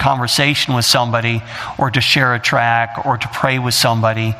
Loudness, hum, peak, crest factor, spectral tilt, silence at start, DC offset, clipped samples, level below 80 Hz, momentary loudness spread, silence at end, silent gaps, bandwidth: -14 LUFS; none; 0 dBFS; 16 dB; -3.5 dB/octave; 0 s; under 0.1%; under 0.1%; -46 dBFS; 7 LU; 0 s; none; 16 kHz